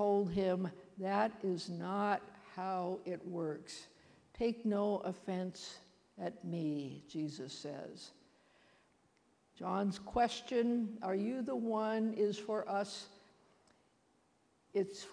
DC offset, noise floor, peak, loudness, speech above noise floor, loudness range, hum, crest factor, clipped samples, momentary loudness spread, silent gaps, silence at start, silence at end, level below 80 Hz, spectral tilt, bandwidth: under 0.1%; -74 dBFS; -20 dBFS; -38 LUFS; 36 dB; 8 LU; none; 20 dB; under 0.1%; 13 LU; none; 0 s; 0 s; -70 dBFS; -6 dB/octave; 10.5 kHz